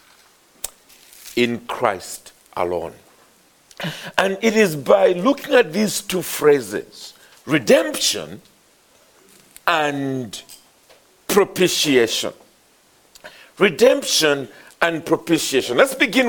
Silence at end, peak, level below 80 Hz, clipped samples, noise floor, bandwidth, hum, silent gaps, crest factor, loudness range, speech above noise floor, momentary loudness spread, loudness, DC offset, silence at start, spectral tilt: 0 s; 0 dBFS; -58 dBFS; under 0.1%; -56 dBFS; over 20 kHz; none; none; 20 dB; 8 LU; 37 dB; 18 LU; -18 LUFS; under 0.1%; 0.65 s; -3.5 dB/octave